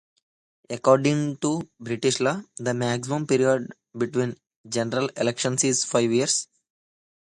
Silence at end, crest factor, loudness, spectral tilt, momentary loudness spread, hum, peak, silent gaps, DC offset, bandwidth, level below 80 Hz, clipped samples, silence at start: 0.8 s; 20 dB; -24 LUFS; -4 dB/octave; 10 LU; none; -4 dBFS; 4.56-4.64 s; under 0.1%; 11.5 kHz; -66 dBFS; under 0.1%; 0.7 s